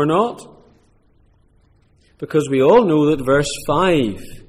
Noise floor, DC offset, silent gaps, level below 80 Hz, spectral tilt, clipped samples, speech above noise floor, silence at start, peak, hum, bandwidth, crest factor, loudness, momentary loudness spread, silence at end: -55 dBFS; under 0.1%; none; -44 dBFS; -6 dB/octave; under 0.1%; 39 dB; 0 s; -4 dBFS; none; 15.5 kHz; 16 dB; -16 LUFS; 11 LU; 0.1 s